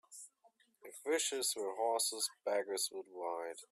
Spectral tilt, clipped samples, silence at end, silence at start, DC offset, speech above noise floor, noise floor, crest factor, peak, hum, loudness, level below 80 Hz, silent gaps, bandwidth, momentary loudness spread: 0.5 dB/octave; under 0.1%; 0.05 s; 0.1 s; under 0.1%; 34 dB; -72 dBFS; 16 dB; -24 dBFS; none; -37 LUFS; under -90 dBFS; none; 15.5 kHz; 19 LU